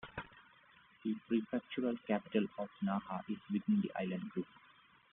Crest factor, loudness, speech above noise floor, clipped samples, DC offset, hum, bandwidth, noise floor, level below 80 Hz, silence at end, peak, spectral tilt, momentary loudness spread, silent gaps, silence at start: 20 dB; -39 LUFS; 28 dB; under 0.1%; under 0.1%; none; 3.9 kHz; -66 dBFS; -74 dBFS; 0.7 s; -20 dBFS; -6 dB/octave; 10 LU; none; 0.05 s